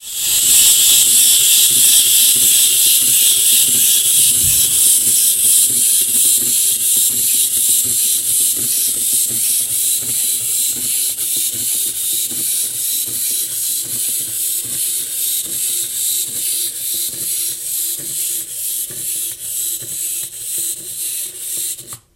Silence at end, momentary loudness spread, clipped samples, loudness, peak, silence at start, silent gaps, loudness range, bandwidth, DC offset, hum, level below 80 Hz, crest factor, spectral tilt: 0.2 s; 12 LU; under 0.1%; -12 LUFS; 0 dBFS; 0 s; none; 10 LU; 17 kHz; under 0.1%; none; -52 dBFS; 16 dB; 2 dB/octave